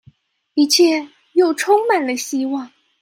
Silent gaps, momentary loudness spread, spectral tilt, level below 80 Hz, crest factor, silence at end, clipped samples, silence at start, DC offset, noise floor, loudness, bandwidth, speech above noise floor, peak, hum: none; 11 LU; -1.5 dB/octave; -72 dBFS; 16 dB; 0.35 s; under 0.1%; 0.55 s; under 0.1%; -52 dBFS; -17 LUFS; 16.5 kHz; 36 dB; -2 dBFS; none